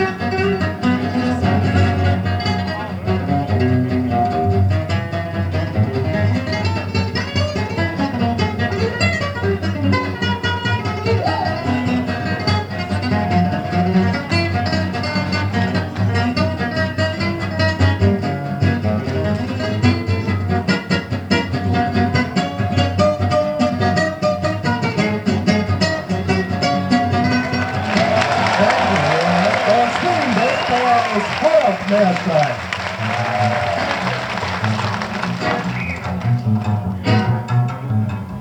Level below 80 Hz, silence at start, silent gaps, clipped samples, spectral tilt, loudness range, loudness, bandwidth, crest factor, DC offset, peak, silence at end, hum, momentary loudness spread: -42 dBFS; 0 s; none; under 0.1%; -6.5 dB/octave; 4 LU; -18 LUFS; 9.6 kHz; 16 dB; under 0.1%; -2 dBFS; 0 s; none; 5 LU